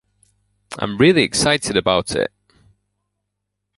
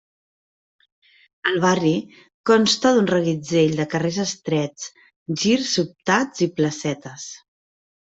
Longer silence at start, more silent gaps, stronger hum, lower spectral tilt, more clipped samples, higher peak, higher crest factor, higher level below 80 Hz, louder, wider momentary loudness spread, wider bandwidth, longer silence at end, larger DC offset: second, 0.7 s vs 1.45 s; second, none vs 2.34-2.44 s, 5.16-5.26 s; first, 50 Hz at -50 dBFS vs none; about the same, -4 dB/octave vs -4.5 dB/octave; neither; about the same, -2 dBFS vs -2 dBFS; about the same, 20 dB vs 20 dB; first, -48 dBFS vs -62 dBFS; first, -17 LUFS vs -21 LUFS; about the same, 13 LU vs 14 LU; first, 11.5 kHz vs 8.2 kHz; first, 1.5 s vs 0.8 s; neither